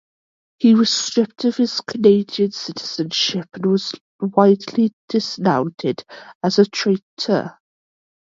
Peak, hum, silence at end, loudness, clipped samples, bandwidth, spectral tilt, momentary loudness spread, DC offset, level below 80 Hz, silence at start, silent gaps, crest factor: 0 dBFS; none; 0.75 s; -19 LUFS; under 0.1%; 7.6 kHz; -5 dB/octave; 10 LU; under 0.1%; -64 dBFS; 0.6 s; 4.01-4.19 s, 4.93-5.08 s, 6.35-6.41 s, 7.02-7.17 s; 18 dB